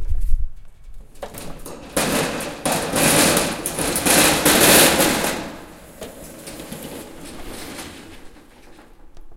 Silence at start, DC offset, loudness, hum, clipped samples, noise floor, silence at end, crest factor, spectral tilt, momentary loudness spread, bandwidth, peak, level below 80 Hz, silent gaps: 0 s; under 0.1%; -16 LUFS; none; under 0.1%; -44 dBFS; 0 s; 20 dB; -2.5 dB/octave; 24 LU; 17 kHz; 0 dBFS; -30 dBFS; none